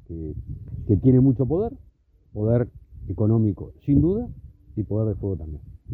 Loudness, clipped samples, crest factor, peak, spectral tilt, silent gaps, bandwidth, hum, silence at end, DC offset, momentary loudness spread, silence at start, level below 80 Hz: -23 LUFS; under 0.1%; 16 dB; -6 dBFS; -14 dB/octave; none; 2.4 kHz; none; 0 s; under 0.1%; 18 LU; 0.1 s; -40 dBFS